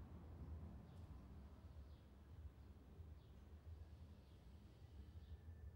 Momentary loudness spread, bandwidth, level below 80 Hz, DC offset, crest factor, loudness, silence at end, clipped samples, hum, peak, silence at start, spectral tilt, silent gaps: 7 LU; 16 kHz; -64 dBFS; under 0.1%; 14 dB; -61 LUFS; 0 s; under 0.1%; none; -46 dBFS; 0 s; -8 dB/octave; none